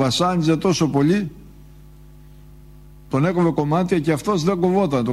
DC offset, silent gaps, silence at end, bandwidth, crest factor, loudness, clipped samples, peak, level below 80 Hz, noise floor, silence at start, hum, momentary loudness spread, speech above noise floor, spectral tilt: under 0.1%; none; 0 s; 13.5 kHz; 14 dB; -19 LUFS; under 0.1%; -6 dBFS; -46 dBFS; -44 dBFS; 0 s; none; 3 LU; 25 dB; -6 dB/octave